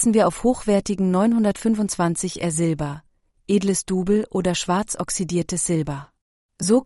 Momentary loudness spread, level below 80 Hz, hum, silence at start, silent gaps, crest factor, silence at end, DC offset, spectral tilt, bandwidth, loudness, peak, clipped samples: 7 LU; -48 dBFS; none; 0 s; 6.21-6.49 s; 16 dB; 0 s; under 0.1%; -5 dB/octave; 11.5 kHz; -22 LUFS; -6 dBFS; under 0.1%